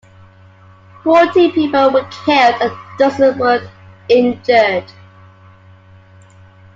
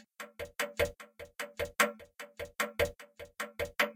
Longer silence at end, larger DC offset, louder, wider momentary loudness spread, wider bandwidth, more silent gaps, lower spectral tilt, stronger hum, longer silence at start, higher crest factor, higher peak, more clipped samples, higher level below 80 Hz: first, 1.9 s vs 0 s; neither; first, -13 LUFS vs -35 LUFS; second, 8 LU vs 18 LU; second, 7.6 kHz vs 17 kHz; neither; first, -5.5 dB/octave vs -2.5 dB/octave; neither; first, 1.05 s vs 0.2 s; second, 14 dB vs 24 dB; first, 0 dBFS vs -12 dBFS; neither; about the same, -58 dBFS vs -56 dBFS